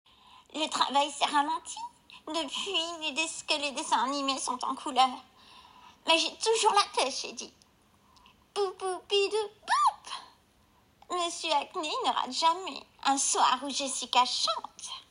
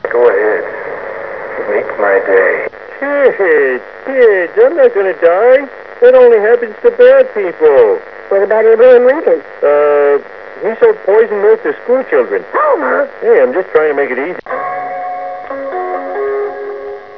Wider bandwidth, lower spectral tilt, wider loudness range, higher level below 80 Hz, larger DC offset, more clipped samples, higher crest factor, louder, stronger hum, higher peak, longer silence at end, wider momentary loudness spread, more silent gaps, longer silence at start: first, 16 kHz vs 5.4 kHz; second, 0 dB/octave vs -7 dB/octave; about the same, 4 LU vs 5 LU; second, -74 dBFS vs -56 dBFS; second, under 0.1% vs 0.4%; second, under 0.1% vs 0.5%; first, 20 dB vs 10 dB; second, -29 LUFS vs -11 LUFS; neither; second, -10 dBFS vs 0 dBFS; about the same, 0.1 s vs 0 s; about the same, 15 LU vs 15 LU; neither; first, 0.55 s vs 0.05 s